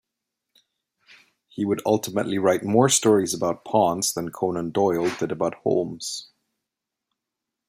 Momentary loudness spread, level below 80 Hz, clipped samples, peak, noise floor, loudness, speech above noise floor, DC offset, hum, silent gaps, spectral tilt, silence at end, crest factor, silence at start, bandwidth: 11 LU; -66 dBFS; under 0.1%; -4 dBFS; -85 dBFS; -23 LUFS; 62 dB; under 0.1%; none; none; -4.5 dB/octave; 1.45 s; 20 dB; 1.55 s; 16 kHz